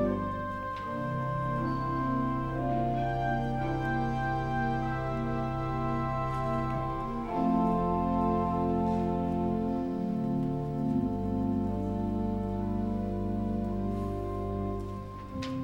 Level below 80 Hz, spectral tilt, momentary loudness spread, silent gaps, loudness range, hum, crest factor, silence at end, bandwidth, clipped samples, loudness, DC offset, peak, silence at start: -42 dBFS; -9 dB/octave; 6 LU; none; 3 LU; none; 14 dB; 0 s; 16.5 kHz; under 0.1%; -31 LUFS; under 0.1%; -18 dBFS; 0 s